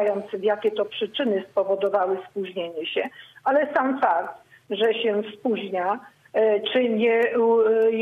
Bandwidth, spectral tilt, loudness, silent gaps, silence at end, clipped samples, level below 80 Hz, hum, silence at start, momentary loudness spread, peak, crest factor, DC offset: 4.5 kHz; -6.5 dB/octave; -23 LUFS; none; 0 s; under 0.1%; -74 dBFS; none; 0 s; 10 LU; -10 dBFS; 14 dB; under 0.1%